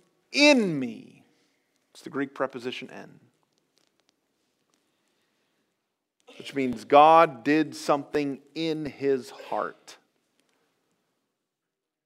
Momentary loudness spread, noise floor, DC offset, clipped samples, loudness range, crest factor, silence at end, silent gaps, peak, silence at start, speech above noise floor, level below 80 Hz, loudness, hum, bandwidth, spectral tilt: 18 LU; -85 dBFS; under 0.1%; under 0.1%; 16 LU; 24 dB; 2.15 s; none; -4 dBFS; 0.3 s; 61 dB; -70 dBFS; -24 LUFS; none; 14 kHz; -4.5 dB/octave